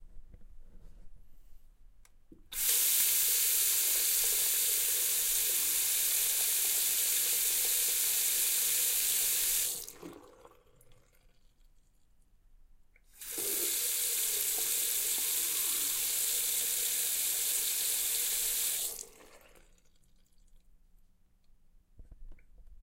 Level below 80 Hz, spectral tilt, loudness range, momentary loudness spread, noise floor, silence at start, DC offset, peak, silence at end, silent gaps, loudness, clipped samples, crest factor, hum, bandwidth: -58 dBFS; 2.5 dB/octave; 9 LU; 5 LU; -64 dBFS; 0 s; under 0.1%; -14 dBFS; 0.1 s; none; -28 LUFS; under 0.1%; 18 dB; none; 16 kHz